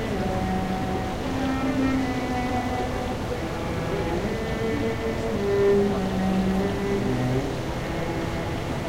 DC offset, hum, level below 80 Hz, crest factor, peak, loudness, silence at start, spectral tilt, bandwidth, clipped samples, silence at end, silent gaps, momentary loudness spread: under 0.1%; none; -38 dBFS; 14 dB; -10 dBFS; -26 LUFS; 0 s; -6.5 dB/octave; 16 kHz; under 0.1%; 0 s; none; 6 LU